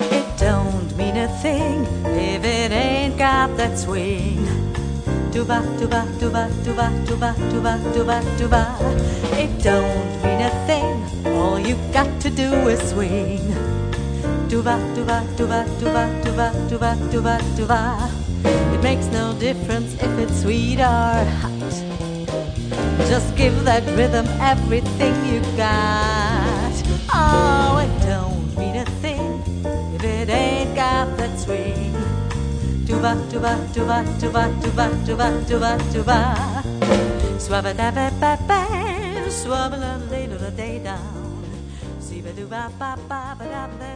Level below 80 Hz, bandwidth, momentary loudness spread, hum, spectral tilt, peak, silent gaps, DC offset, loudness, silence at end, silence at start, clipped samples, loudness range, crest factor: -28 dBFS; 10 kHz; 8 LU; none; -6 dB/octave; 0 dBFS; none; under 0.1%; -20 LUFS; 0 s; 0 s; under 0.1%; 3 LU; 18 dB